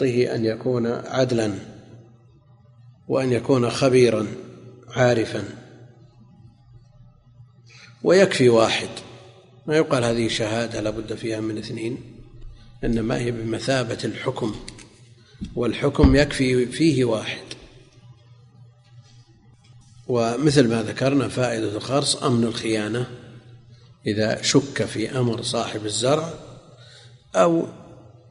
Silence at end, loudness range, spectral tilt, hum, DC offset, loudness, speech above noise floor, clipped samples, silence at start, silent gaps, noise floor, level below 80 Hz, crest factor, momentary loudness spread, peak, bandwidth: 0.35 s; 6 LU; -5.5 dB/octave; none; under 0.1%; -22 LUFS; 31 dB; under 0.1%; 0 s; none; -52 dBFS; -42 dBFS; 22 dB; 17 LU; 0 dBFS; 11 kHz